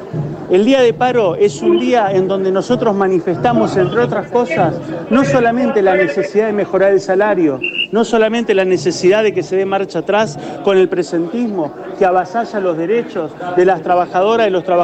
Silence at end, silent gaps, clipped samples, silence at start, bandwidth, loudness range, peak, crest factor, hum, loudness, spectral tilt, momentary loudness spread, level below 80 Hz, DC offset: 0 s; none; under 0.1%; 0 s; 8.6 kHz; 3 LU; -2 dBFS; 10 dB; none; -14 LUFS; -6 dB/octave; 6 LU; -50 dBFS; under 0.1%